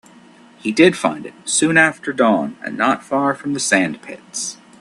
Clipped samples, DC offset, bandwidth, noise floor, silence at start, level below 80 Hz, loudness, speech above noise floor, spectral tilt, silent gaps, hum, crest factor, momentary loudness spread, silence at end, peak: under 0.1%; under 0.1%; 12.5 kHz; -46 dBFS; 0.65 s; -62 dBFS; -17 LUFS; 28 dB; -3.5 dB/octave; none; none; 18 dB; 13 LU; 0.25 s; 0 dBFS